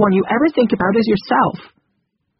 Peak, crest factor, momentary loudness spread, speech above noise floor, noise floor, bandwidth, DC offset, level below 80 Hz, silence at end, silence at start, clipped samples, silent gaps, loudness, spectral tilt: 0 dBFS; 16 dB; 3 LU; 54 dB; -69 dBFS; 5.8 kHz; under 0.1%; -50 dBFS; 0.75 s; 0 s; under 0.1%; none; -16 LUFS; -5.5 dB/octave